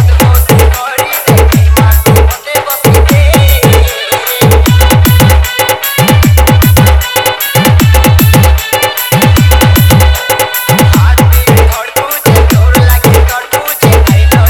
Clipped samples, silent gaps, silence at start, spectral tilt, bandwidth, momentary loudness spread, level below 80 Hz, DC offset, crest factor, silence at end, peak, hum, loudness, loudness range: 4%; none; 0 s; -5 dB/octave; over 20 kHz; 5 LU; -12 dBFS; 0.4%; 6 dB; 0 s; 0 dBFS; none; -6 LUFS; 1 LU